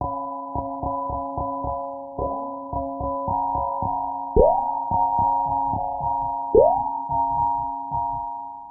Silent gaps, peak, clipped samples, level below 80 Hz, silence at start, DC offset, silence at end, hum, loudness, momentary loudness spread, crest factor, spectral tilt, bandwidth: none; -2 dBFS; under 0.1%; -38 dBFS; 0 s; under 0.1%; 0 s; none; -24 LUFS; 11 LU; 22 dB; -11.5 dB/octave; 1.2 kHz